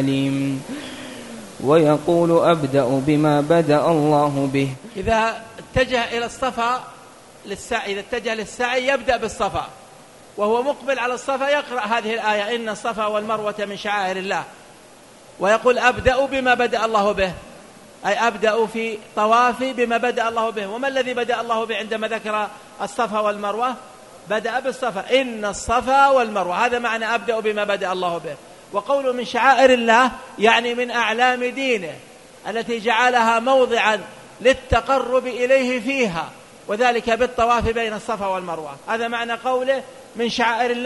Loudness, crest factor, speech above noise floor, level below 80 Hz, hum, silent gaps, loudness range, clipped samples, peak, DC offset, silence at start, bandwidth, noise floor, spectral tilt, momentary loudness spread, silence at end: -20 LUFS; 20 dB; 26 dB; -46 dBFS; none; none; 6 LU; under 0.1%; 0 dBFS; under 0.1%; 0 s; 11.5 kHz; -46 dBFS; -4.5 dB/octave; 12 LU; 0 s